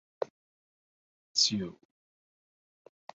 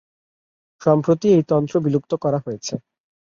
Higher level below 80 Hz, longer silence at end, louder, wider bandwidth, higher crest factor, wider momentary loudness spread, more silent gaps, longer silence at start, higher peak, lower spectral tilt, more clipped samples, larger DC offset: second, -72 dBFS vs -60 dBFS; first, 1.45 s vs 0.45 s; second, -30 LUFS vs -20 LUFS; about the same, 7.6 kHz vs 7.6 kHz; first, 26 dB vs 16 dB; about the same, 14 LU vs 12 LU; first, 0.30-1.35 s vs none; second, 0.2 s vs 0.8 s; second, -12 dBFS vs -4 dBFS; second, -3 dB/octave vs -7.5 dB/octave; neither; neither